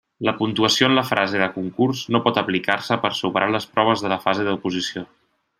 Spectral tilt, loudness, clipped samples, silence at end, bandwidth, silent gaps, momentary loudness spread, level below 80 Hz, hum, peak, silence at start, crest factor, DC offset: -4.5 dB/octave; -20 LUFS; under 0.1%; 0.55 s; 15.5 kHz; none; 8 LU; -62 dBFS; none; -2 dBFS; 0.2 s; 20 dB; under 0.1%